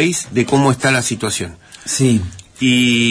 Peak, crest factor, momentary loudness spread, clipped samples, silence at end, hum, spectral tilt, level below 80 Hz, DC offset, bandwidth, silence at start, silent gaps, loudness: -2 dBFS; 14 dB; 12 LU; under 0.1%; 0 s; none; -4 dB/octave; -46 dBFS; under 0.1%; 11 kHz; 0 s; none; -15 LUFS